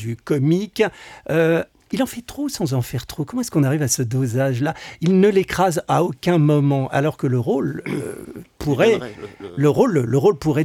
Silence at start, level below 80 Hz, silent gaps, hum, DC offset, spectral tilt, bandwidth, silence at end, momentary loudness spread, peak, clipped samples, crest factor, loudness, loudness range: 0 s; -50 dBFS; none; none; under 0.1%; -6 dB/octave; 17 kHz; 0 s; 11 LU; -4 dBFS; under 0.1%; 16 dB; -20 LUFS; 3 LU